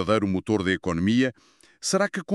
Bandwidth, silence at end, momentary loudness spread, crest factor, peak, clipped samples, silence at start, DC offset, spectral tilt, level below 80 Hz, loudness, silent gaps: 13 kHz; 0 s; 4 LU; 18 dB; -6 dBFS; under 0.1%; 0 s; under 0.1%; -5 dB/octave; -54 dBFS; -24 LUFS; none